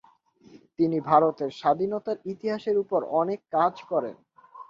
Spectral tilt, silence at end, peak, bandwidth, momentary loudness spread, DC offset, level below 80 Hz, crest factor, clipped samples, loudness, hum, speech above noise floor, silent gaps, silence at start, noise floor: -8 dB/octave; 0.05 s; -6 dBFS; 7.4 kHz; 10 LU; under 0.1%; -70 dBFS; 20 dB; under 0.1%; -26 LUFS; none; 32 dB; none; 0.55 s; -57 dBFS